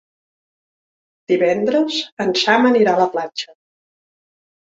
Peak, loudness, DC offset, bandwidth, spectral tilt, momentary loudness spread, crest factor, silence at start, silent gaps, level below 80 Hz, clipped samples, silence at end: -2 dBFS; -17 LUFS; under 0.1%; 8 kHz; -4.5 dB/octave; 12 LU; 18 dB; 1.3 s; 2.12-2.17 s; -66 dBFS; under 0.1%; 1.25 s